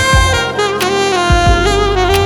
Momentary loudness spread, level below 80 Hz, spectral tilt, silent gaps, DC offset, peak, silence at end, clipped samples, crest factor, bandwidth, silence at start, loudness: 3 LU; -18 dBFS; -4 dB/octave; none; under 0.1%; 0 dBFS; 0 s; under 0.1%; 12 dB; 19.5 kHz; 0 s; -12 LUFS